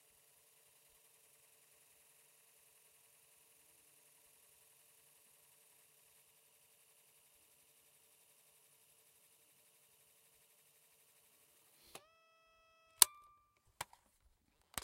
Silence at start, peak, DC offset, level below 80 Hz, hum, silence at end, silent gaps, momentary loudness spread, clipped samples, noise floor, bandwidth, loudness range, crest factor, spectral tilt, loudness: 13 s; -2 dBFS; under 0.1%; -82 dBFS; none; 1.75 s; none; 35 LU; under 0.1%; -75 dBFS; 16 kHz; 28 LU; 48 dB; 2 dB/octave; -34 LUFS